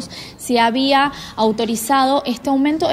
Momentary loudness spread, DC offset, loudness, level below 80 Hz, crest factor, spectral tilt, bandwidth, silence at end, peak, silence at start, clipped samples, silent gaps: 6 LU; under 0.1%; -17 LUFS; -50 dBFS; 14 dB; -3.5 dB/octave; 16 kHz; 0 s; -4 dBFS; 0 s; under 0.1%; none